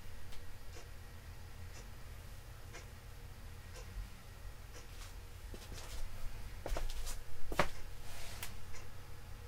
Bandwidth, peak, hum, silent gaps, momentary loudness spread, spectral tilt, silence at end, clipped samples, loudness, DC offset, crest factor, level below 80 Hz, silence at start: 16 kHz; -12 dBFS; none; none; 11 LU; -4 dB/octave; 0 s; under 0.1%; -48 LUFS; under 0.1%; 28 dB; -48 dBFS; 0 s